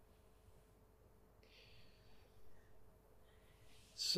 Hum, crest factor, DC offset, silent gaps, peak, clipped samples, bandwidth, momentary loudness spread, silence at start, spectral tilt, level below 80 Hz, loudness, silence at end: none; 26 dB; under 0.1%; none; -26 dBFS; under 0.1%; 15 kHz; 9 LU; 0 s; -1 dB/octave; -72 dBFS; -53 LUFS; 0 s